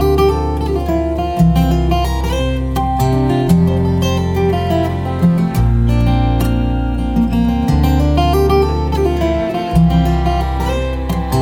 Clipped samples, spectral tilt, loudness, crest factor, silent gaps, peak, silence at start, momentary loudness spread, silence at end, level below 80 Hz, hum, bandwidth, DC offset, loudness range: under 0.1%; -7.5 dB/octave; -15 LUFS; 14 dB; none; 0 dBFS; 0 s; 5 LU; 0 s; -20 dBFS; none; 17.5 kHz; under 0.1%; 1 LU